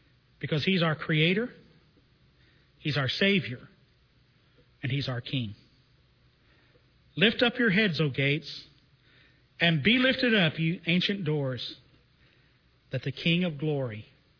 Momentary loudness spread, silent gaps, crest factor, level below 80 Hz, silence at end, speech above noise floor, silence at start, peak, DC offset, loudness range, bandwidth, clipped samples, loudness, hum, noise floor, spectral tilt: 15 LU; none; 22 dB; -62 dBFS; 0.35 s; 37 dB; 0.4 s; -8 dBFS; under 0.1%; 6 LU; 5.4 kHz; under 0.1%; -27 LUFS; none; -64 dBFS; -7 dB/octave